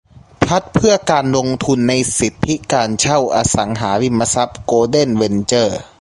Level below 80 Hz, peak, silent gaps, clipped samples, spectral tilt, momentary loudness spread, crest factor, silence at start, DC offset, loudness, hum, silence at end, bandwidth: -40 dBFS; 0 dBFS; none; under 0.1%; -4.5 dB/octave; 4 LU; 16 dB; 0.4 s; under 0.1%; -15 LUFS; none; 0.15 s; 11.5 kHz